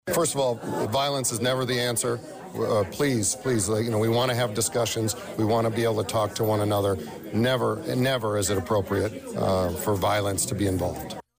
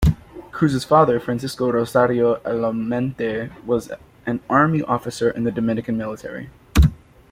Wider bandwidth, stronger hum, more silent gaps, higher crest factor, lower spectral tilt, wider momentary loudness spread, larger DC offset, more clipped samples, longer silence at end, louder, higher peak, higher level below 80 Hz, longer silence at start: about the same, 16 kHz vs 16 kHz; neither; neither; second, 10 dB vs 18 dB; second, -4.5 dB/octave vs -7 dB/octave; second, 5 LU vs 13 LU; neither; neither; second, 0.15 s vs 0.35 s; second, -25 LUFS vs -20 LUFS; second, -14 dBFS vs -4 dBFS; second, -54 dBFS vs -30 dBFS; about the same, 0.05 s vs 0 s